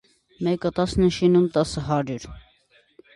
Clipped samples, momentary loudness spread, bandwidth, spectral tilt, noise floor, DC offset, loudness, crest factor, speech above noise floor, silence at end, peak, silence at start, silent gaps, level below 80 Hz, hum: under 0.1%; 13 LU; 11.5 kHz; -6.5 dB/octave; -61 dBFS; under 0.1%; -22 LUFS; 16 dB; 39 dB; 0.75 s; -8 dBFS; 0.4 s; none; -44 dBFS; none